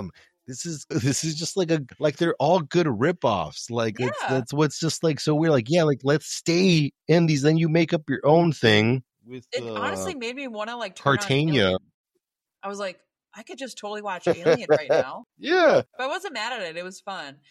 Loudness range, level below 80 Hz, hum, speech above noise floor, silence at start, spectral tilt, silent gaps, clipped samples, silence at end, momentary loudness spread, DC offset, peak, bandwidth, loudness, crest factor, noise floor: 6 LU; -62 dBFS; none; 55 dB; 0 s; -5.5 dB/octave; 11.94-12.04 s; under 0.1%; 0.2 s; 15 LU; under 0.1%; -4 dBFS; 13.5 kHz; -23 LUFS; 20 dB; -78 dBFS